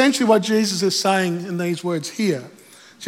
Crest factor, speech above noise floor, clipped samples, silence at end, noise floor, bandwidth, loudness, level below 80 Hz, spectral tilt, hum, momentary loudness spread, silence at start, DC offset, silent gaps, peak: 16 dB; 23 dB; under 0.1%; 0 s; -43 dBFS; 17 kHz; -20 LUFS; -80 dBFS; -4 dB/octave; none; 8 LU; 0 s; under 0.1%; none; -4 dBFS